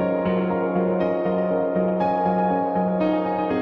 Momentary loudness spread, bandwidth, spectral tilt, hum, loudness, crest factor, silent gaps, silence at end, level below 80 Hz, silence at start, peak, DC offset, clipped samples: 2 LU; 5.4 kHz; -10 dB/octave; none; -22 LUFS; 12 dB; none; 0 s; -56 dBFS; 0 s; -10 dBFS; under 0.1%; under 0.1%